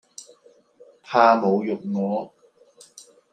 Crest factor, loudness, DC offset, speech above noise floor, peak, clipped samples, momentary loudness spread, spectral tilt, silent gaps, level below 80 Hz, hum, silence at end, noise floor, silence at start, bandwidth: 22 dB; -21 LUFS; under 0.1%; 35 dB; -2 dBFS; under 0.1%; 25 LU; -6 dB/octave; none; -78 dBFS; none; 1.05 s; -55 dBFS; 0.2 s; 10.5 kHz